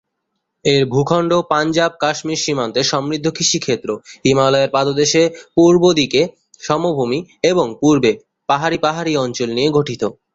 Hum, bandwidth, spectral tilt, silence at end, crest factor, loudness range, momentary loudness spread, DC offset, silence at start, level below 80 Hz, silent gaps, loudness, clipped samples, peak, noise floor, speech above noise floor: none; 8 kHz; -4.5 dB/octave; 0.2 s; 14 dB; 2 LU; 7 LU; under 0.1%; 0.65 s; -52 dBFS; none; -16 LUFS; under 0.1%; -2 dBFS; -74 dBFS; 58 dB